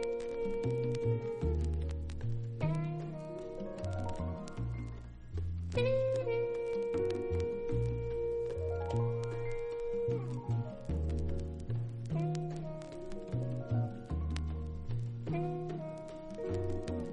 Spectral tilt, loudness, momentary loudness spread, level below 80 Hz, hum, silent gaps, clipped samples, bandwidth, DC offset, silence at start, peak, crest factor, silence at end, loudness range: -8 dB/octave; -37 LUFS; 8 LU; -44 dBFS; none; none; under 0.1%; 9.8 kHz; under 0.1%; 0 s; -20 dBFS; 16 dB; 0 s; 4 LU